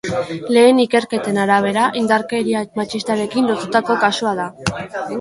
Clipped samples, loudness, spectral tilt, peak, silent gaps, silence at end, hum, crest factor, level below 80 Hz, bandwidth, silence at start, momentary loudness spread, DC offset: under 0.1%; -17 LUFS; -5 dB/octave; 0 dBFS; none; 0 s; none; 16 dB; -52 dBFS; 11.5 kHz; 0.05 s; 11 LU; under 0.1%